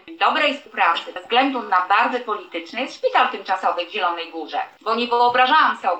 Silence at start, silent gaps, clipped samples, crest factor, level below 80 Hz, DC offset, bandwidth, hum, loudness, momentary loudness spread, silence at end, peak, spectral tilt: 0.05 s; none; under 0.1%; 16 dB; -76 dBFS; under 0.1%; 8.6 kHz; none; -20 LUFS; 12 LU; 0 s; -4 dBFS; -2.5 dB/octave